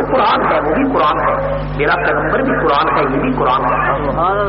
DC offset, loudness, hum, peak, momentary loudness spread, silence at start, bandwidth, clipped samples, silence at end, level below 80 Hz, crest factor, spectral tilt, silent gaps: under 0.1%; -14 LUFS; 50 Hz at -25 dBFS; -4 dBFS; 3 LU; 0 s; 5.8 kHz; under 0.1%; 0 s; -30 dBFS; 10 dB; -4 dB/octave; none